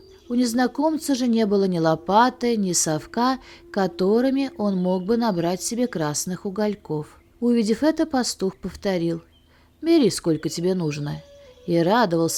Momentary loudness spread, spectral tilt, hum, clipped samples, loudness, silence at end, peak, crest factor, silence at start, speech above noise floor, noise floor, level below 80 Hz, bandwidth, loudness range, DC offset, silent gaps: 11 LU; -5 dB/octave; none; under 0.1%; -22 LUFS; 0 s; -4 dBFS; 18 dB; 0.3 s; 34 dB; -56 dBFS; -56 dBFS; 17.5 kHz; 3 LU; under 0.1%; none